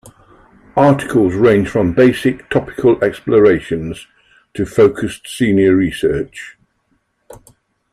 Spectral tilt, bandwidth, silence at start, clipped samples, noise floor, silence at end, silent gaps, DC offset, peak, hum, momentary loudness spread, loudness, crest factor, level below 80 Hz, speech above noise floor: -7 dB/octave; 14 kHz; 0.75 s; under 0.1%; -63 dBFS; 0.55 s; none; under 0.1%; 0 dBFS; none; 13 LU; -14 LUFS; 14 dB; -44 dBFS; 50 dB